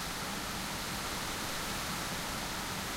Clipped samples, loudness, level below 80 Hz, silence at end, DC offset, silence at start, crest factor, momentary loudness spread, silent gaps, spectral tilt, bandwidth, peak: under 0.1%; -36 LUFS; -50 dBFS; 0 s; under 0.1%; 0 s; 14 dB; 1 LU; none; -2.5 dB/octave; 16 kHz; -24 dBFS